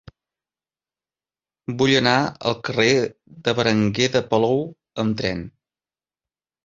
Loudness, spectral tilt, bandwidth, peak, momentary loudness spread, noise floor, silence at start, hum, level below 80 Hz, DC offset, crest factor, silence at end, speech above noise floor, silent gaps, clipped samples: -20 LUFS; -5 dB/octave; 7.8 kHz; -2 dBFS; 14 LU; under -90 dBFS; 1.7 s; none; -54 dBFS; under 0.1%; 20 dB; 1.15 s; over 70 dB; none; under 0.1%